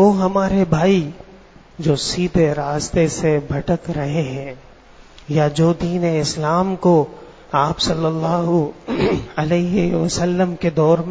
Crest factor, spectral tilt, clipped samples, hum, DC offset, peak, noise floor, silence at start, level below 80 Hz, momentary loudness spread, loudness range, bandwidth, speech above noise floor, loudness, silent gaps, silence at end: 16 dB; -6 dB/octave; under 0.1%; none; under 0.1%; -2 dBFS; -44 dBFS; 0 s; -40 dBFS; 6 LU; 2 LU; 8 kHz; 27 dB; -18 LUFS; none; 0 s